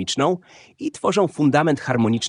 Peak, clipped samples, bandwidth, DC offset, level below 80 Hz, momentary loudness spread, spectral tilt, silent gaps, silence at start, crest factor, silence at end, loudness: -2 dBFS; under 0.1%; 10.5 kHz; under 0.1%; -62 dBFS; 12 LU; -5 dB/octave; none; 0 s; 18 dB; 0 s; -20 LUFS